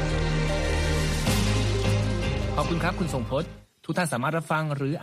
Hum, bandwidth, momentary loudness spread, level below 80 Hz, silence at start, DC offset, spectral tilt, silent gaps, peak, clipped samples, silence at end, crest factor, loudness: none; 15.5 kHz; 5 LU; -32 dBFS; 0 s; under 0.1%; -5.5 dB/octave; none; -12 dBFS; under 0.1%; 0 s; 14 dB; -26 LUFS